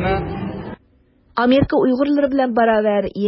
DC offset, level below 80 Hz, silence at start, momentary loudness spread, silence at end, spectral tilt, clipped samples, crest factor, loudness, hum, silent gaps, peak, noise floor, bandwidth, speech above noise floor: under 0.1%; -38 dBFS; 0 s; 13 LU; 0 s; -11.5 dB/octave; under 0.1%; 12 dB; -17 LUFS; none; none; -4 dBFS; -55 dBFS; 5.8 kHz; 40 dB